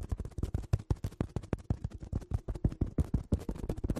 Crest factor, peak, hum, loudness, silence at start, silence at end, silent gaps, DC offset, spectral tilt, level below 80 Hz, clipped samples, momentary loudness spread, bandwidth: 20 dB; -16 dBFS; none; -37 LUFS; 0 s; 0 s; none; under 0.1%; -8.5 dB/octave; -38 dBFS; under 0.1%; 6 LU; 13.5 kHz